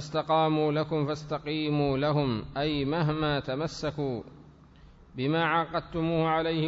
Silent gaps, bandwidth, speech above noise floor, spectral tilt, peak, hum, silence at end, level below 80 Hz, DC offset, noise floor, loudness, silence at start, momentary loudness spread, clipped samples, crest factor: none; 7.8 kHz; 25 dB; -7 dB/octave; -14 dBFS; none; 0 s; -52 dBFS; under 0.1%; -53 dBFS; -28 LUFS; 0 s; 7 LU; under 0.1%; 16 dB